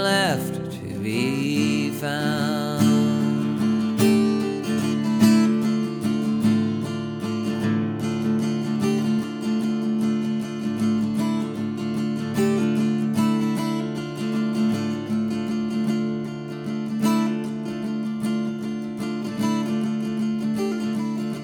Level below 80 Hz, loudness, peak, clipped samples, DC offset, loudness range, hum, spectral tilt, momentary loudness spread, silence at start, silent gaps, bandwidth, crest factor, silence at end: -60 dBFS; -23 LUFS; -4 dBFS; under 0.1%; under 0.1%; 5 LU; none; -6 dB/octave; 8 LU; 0 s; none; 20 kHz; 20 dB; 0 s